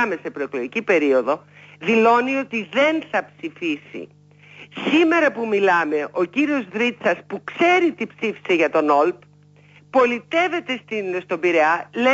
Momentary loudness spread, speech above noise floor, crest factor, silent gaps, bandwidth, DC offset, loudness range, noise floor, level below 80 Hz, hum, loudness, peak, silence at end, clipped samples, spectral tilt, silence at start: 11 LU; 31 dB; 16 dB; none; 7.8 kHz; under 0.1%; 2 LU; -51 dBFS; -72 dBFS; 50 Hz at -50 dBFS; -20 LUFS; -6 dBFS; 0 s; under 0.1%; -5 dB/octave; 0 s